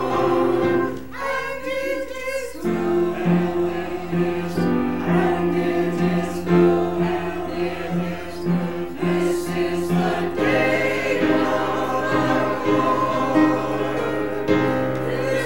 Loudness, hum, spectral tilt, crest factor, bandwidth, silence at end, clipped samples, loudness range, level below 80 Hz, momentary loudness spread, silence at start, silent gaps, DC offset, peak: -21 LUFS; none; -6.5 dB/octave; 16 dB; 16.5 kHz; 0 s; under 0.1%; 3 LU; -48 dBFS; 7 LU; 0 s; none; 1%; -4 dBFS